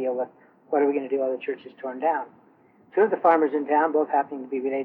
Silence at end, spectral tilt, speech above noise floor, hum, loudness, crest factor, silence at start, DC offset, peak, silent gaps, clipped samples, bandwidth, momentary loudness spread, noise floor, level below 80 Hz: 0 s; -8.5 dB/octave; 33 dB; none; -24 LUFS; 18 dB; 0 s; under 0.1%; -6 dBFS; none; under 0.1%; 4.1 kHz; 13 LU; -57 dBFS; -80 dBFS